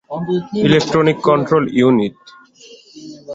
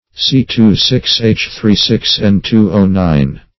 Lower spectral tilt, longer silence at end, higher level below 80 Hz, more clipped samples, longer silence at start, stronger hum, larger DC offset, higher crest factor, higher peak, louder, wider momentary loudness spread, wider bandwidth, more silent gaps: about the same, -6.5 dB/octave vs -6 dB/octave; second, 0 s vs 0.2 s; second, -52 dBFS vs -30 dBFS; neither; about the same, 0.1 s vs 0.15 s; neither; second, under 0.1% vs 0.9%; about the same, 14 dB vs 12 dB; about the same, -2 dBFS vs 0 dBFS; second, -15 LUFS vs -11 LUFS; first, 10 LU vs 3 LU; first, 8 kHz vs 6.2 kHz; neither